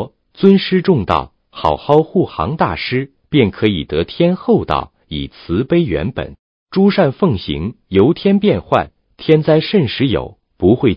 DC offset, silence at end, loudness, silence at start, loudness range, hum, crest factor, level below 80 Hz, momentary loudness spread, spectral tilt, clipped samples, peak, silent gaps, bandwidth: under 0.1%; 0 s; -15 LUFS; 0 s; 3 LU; none; 14 dB; -36 dBFS; 12 LU; -9.5 dB/octave; under 0.1%; 0 dBFS; 6.39-6.66 s; 5.4 kHz